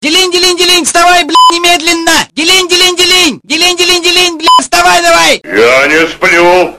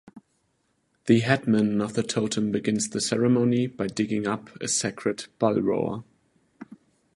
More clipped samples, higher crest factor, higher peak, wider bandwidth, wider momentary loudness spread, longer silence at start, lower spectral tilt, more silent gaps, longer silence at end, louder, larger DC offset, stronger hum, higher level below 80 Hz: first, 0.7% vs under 0.1%; second, 6 dB vs 22 dB; first, 0 dBFS vs -4 dBFS; first, 17 kHz vs 11.5 kHz; second, 3 LU vs 9 LU; second, 0 s vs 0.15 s; second, -1 dB/octave vs -5 dB/octave; neither; second, 0 s vs 0.4 s; first, -5 LUFS vs -25 LUFS; first, 1% vs under 0.1%; neither; first, -36 dBFS vs -62 dBFS